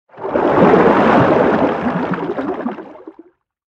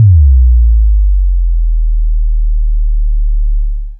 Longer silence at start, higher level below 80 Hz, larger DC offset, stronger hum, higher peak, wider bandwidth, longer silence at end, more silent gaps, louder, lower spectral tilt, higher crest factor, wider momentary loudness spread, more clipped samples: first, 0.15 s vs 0 s; second, -48 dBFS vs -8 dBFS; neither; neither; about the same, 0 dBFS vs 0 dBFS; first, 8.2 kHz vs 0.2 kHz; first, 0.65 s vs 0 s; neither; about the same, -14 LUFS vs -13 LUFS; second, -8.5 dB/octave vs -14.5 dB/octave; first, 14 dB vs 8 dB; first, 13 LU vs 8 LU; neither